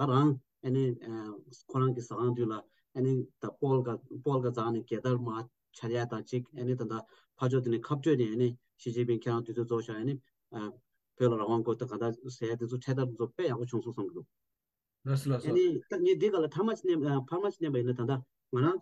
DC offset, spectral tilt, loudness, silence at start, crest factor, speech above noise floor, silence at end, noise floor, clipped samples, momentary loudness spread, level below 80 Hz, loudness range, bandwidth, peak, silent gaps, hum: under 0.1%; -8 dB/octave; -33 LUFS; 0 s; 18 dB; 58 dB; 0 s; -90 dBFS; under 0.1%; 13 LU; -78 dBFS; 4 LU; 12 kHz; -14 dBFS; none; none